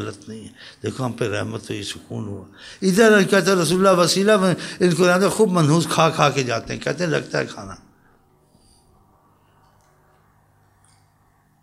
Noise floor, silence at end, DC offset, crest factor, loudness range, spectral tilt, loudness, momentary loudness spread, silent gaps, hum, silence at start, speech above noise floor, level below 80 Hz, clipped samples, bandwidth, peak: -59 dBFS; 3.85 s; under 0.1%; 20 dB; 12 LU; -5 dB/octave; -19 LUFS; 19 LU; none; none; 0 s; 40 dB; -56 dBFS; under 0.1%; 15.5 kHz; -2 dBFS